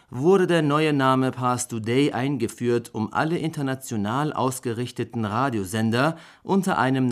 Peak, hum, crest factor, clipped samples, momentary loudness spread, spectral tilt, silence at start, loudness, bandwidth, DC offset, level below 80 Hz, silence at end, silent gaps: -8 dBFS; none; 16 dB; under 0.1%; 8 LU; -6 dB/octave; 0.1 s; -23 LUFS; 15.5 kHz; under 0.1%; -66 dBFS; 0 s; none